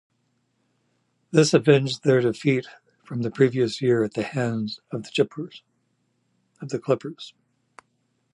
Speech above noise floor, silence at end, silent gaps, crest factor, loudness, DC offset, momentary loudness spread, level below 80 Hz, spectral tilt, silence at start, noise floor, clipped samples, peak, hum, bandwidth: 48 dB; 1.05 s; none; 22 dB; -23 LUFS; under 0.1%; 18 LU; -68 dBFS; -6 dB/octave; 1.35 s; -71 dBFS; under 0.1%; -4 dBFS; none; 11.5 kHz